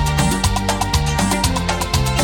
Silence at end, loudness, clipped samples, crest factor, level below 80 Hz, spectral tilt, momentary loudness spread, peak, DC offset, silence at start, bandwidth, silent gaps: 0 s; -18 LUFS; under 0.1%; 14 dB; -24 dBFS; -4 dB/octave; 2 LU; -4 dBFS; under 0.1%; 0 s; 19 kHz; none